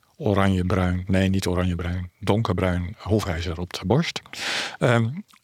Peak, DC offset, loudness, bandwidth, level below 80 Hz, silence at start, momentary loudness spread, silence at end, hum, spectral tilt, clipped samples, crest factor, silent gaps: -4 dBFS; under 0.1%; -24 LUFS; 15 kHz; -48 dBFS; 0.2 s; 8 LU; 0.2 s; none; -6 dB/octave; under 0.1%; 20 dB; none